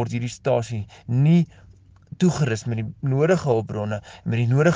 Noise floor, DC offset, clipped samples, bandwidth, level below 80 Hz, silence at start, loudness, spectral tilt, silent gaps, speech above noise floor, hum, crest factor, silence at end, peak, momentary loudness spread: -43 dBFS; under 0.1%; under 0.1%; 9.6 kHz; -54 dBFS; 0 s; -23 LUFS; -7.5 dB/octave; none; 22 dB; none; 16 dB; 0 s; -6 dBFS; 11 LU